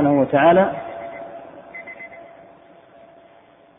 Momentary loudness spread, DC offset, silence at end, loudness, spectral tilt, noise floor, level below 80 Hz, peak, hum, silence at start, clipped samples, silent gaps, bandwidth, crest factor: 24 LU; under 0.1%; 1.55 s; -16 LUFS; -11 dB/octave; -51 dBFS; -60 dBFS; -4 dBFS; none; 0 s; under 0.1%; none; 3.8 kHz; 18 dB